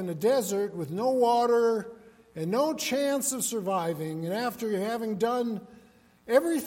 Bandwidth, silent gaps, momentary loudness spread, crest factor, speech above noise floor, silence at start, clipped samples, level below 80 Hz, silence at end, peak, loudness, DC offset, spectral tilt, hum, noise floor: 16.5 kHz; none; 9 LU; 18 dB; 30 dB; 0 s; under 0.1%; -70 dBFS; 0 s; -10 dBFS; -28 LUFS; under 0.1%; -4.5 dB/octave; none; -58 dBFS